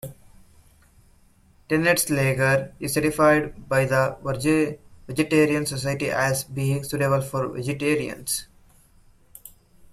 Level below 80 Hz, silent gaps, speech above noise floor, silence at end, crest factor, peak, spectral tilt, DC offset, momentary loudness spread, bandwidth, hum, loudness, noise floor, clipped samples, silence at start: -52 dBFS; none; 34 dB; 0.45 s; 18 dB; -6 dBFS; -5 dB/octave; under 0.1%; 8 LU; 15.5 kHz; none; -23 LUFS; -57 dBFS; under 0.1%; 0.05 s